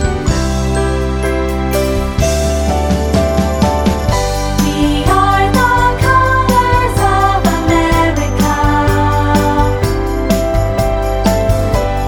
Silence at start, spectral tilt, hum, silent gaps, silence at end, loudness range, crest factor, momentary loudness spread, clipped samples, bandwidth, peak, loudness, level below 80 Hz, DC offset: 0 s; -5.5 dB/octave; none; none; 0 s; 3 LU; 12 dB; 5 LU; under 0.1%; 19.5 kHz; 0 dBFS; -13 LUFS; -18 dBFS; under 0.1%